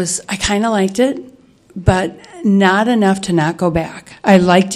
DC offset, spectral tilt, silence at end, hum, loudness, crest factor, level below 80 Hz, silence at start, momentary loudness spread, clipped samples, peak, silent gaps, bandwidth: under 0.1%; -5 dB/octave; 0 s; none; -15 LUFS; 14 dB; -36 dBFS; 0 s; 9 LU; under 0.1%; 0 dBFS; none; 12.5 kHz